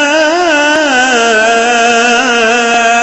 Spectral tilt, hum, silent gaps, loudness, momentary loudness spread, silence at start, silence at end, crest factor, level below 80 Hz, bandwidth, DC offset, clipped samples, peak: -1 dB/octave; none; none; -8 LUFS; 1 LU; 0 s; 0 s; 8 dB; -48 dBFS; 8.4 kHz; under 0.1%; under 0.1%; 0 dBFS